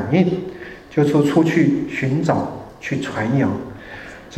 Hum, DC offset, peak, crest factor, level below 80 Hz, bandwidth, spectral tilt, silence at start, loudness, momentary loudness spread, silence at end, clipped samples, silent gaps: none; under 0.1%; -4 dBFS; 16 dB; -50 dBFS; 12.5 kHz; -7.5 dB/octave; 0 s; -19 LUFS; 18 LU; 0 s; under 0.1%; none